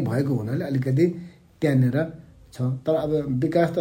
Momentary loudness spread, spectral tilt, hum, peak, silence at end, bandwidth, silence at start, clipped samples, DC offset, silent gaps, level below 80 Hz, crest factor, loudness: 7 LU; -8.5 dB/octave; none; -8 dBFS; 0 s; 15.5 kHz; 0 s; under 0.1%; under 0.1%; none; -54 dBFS; 16 dB; -24 LUFS